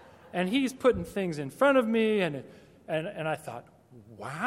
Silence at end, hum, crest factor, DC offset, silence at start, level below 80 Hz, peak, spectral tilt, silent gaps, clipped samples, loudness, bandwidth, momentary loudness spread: 0 s; none; 18 dB; under 0.1%; 0.25 s; -60 dBFS; -12 dBFS; -6 dB/octave; none; under 0.1%; -28 LUFS; 15.5 kHz; 17 LU